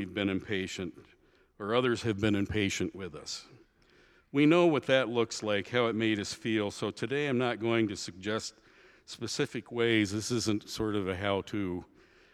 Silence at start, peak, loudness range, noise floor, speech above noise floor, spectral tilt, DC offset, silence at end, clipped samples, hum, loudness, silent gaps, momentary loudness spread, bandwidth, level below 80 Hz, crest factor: 0 s; -10 dBFS; 4 LU; -63 dBFS; 33 dB; -5 dB/octave; under 0.1%; 0.5 s; under 0.1%; none; -31 LUFS; none; 12 LU; 13.5 kHz; -62 dBFS; 22 dB